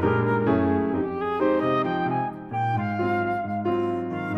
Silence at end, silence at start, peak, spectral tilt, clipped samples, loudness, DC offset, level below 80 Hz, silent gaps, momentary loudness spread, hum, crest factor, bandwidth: 0 s; 0 s; -10 dBFS; -9.5 dB/octave; under 0.1%; -25 LUFS; under 0.1%; -56 dBFS; none; 5 LU; none; 14 dB; 6.6 kHz